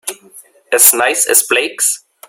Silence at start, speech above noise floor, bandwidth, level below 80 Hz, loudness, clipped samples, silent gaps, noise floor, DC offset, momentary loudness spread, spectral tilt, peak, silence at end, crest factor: 0.05 s; 30 dB; over 20 kHz; -64 dBFS; -10 LUFS; 0.3%; none; -42 dBFS; under 0.1%; 9 LU; 1.5 dB/octave; 0 dBFS; 0.3 s; 14 dB